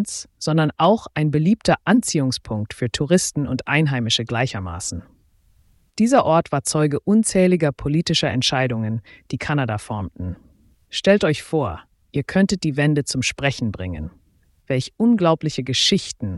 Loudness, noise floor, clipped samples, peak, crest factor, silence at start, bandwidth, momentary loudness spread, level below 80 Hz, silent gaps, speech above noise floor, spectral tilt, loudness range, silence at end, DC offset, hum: -20 LUFS; -59 dBFS; under 0.1%; -4 dBFS; 16 dB; 0 s; 12 kHz; 12 LU; -46 dBFS; none; 39 dB; -5 dB/octave; 4 LU; 0 s; under 0.1%; none